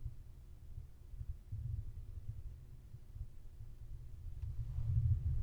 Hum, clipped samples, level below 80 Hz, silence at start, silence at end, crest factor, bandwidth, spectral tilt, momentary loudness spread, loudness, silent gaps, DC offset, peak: none; under 0.1%; -46 dBFS; 0 s; 0 s; 18 dB; 6.2 kHz; -9 dB/octave; 20 LU; -45 LUFS; none; under 0.1%; -24 dBFS